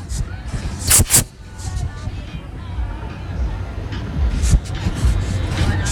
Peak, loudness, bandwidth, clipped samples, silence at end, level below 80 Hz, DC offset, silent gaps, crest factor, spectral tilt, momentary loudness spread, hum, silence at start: -2 dBFS; -20 LUFS; over 20 kHz; under 0.1%; 0 s; -24 dBFS; under 0.1%; none; 18 dB; -3.5 dB/octave; 17 LU; none; 0 s